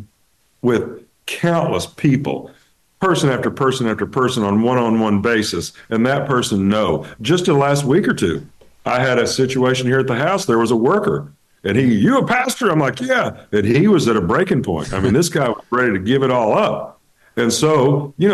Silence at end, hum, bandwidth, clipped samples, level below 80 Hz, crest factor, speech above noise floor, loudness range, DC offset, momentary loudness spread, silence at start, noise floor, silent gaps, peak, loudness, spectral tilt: 0 s; none; 12.5 kHz; under 0.1%; -48 dBFS; 12 dB; 45 dB; 2 LU; under 0.1%; 7 LU; 0 s; -61 dBFS; none; -4 dBFS; -17 LUFS; -5.5 dB/octave